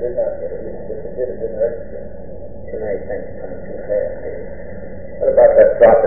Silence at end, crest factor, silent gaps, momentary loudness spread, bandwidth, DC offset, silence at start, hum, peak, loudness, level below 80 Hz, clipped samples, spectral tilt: 0 s; 18 dB; none; 23 LU; 3.1 kHz; 4%; 0 s; none; 0 dBFS; -17 LUFS; -38 dBFS; under 0.1%; -11.5 dB/octave